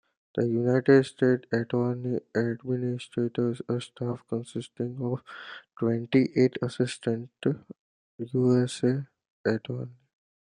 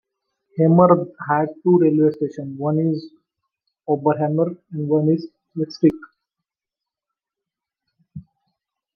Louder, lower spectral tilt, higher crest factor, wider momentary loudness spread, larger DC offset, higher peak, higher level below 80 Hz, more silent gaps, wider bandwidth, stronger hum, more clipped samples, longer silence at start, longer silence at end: second, -28 LUFS vs -19 LUFS; second, -7 dB/octave vs -10 dB/octave; about the same, 20 dB vs 20 dB; about the same, 13 LU vs 14 LU; neither; second, -8 dBFS vs -2 dBFS; second, -70 dBFS vs -64 dBFS; first, 7.79-8.18 s, 9.30-9.44 s vs none; first, 10.5 kHz vs 6 kHz; neither; neither; second, 0.35 s vs 0.55 s; second, 0.55 s vs 0.75 s